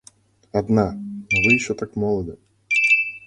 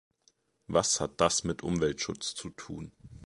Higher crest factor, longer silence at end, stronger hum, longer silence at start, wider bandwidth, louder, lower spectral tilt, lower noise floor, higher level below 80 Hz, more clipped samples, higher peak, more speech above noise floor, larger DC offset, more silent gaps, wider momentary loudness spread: second, 18 dB vs 24 dB; about the same, 0.1 s vs 0 s; neither; second, 0.55 s vs 0.7 s; about the same, 11 kHz vs 11.5 kHz; first, -19 LUFS vs -30 LUFS; first, -5.5 dB/octave vs -3.5 dB/octave; second, -53 dBFS vs -70 dBFS; first, -48 dBFS vs -54 dBFS; neither; first, -4 dBFS vs -10 dBFS; second, 32 dB vs 39 dB; neither; neither; second, 11 LU vs 16 LU